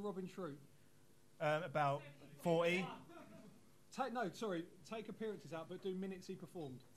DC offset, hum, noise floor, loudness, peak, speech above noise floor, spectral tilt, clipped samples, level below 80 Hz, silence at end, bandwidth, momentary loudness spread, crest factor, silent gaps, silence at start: under 0.1%; none; -70 dBFS; -43 LUFS; -26 dBFS; 27 dB; -6 dB/octave; under 0.1%; -84 dBFS; 0.1 s; 13 kHz; 18 LU; 20 dB; none; 0 s